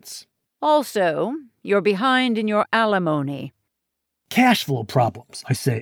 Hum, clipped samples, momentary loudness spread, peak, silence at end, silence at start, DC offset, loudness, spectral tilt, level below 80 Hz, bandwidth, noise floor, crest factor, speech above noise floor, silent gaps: none; under 0.1%; 15 LU; -4 dBFS; 0 s; 0.05 s; under 0.1%; -20 LUFS; -5.5 dB/octave; -70 dBFS; over 20 kHz; -80 dBFS; 18 dB; 60 dB; none